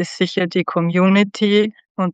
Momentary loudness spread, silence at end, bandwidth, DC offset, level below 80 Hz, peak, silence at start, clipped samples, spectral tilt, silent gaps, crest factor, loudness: 7 LU; 0 s; 8.6 kHz; under 0.1%; -70 dBFS; -2 dBFS; 0 s; under 0.1%; -6.5 dB/octave; 1.90-1.95 s; 14 dB; -17 LUFS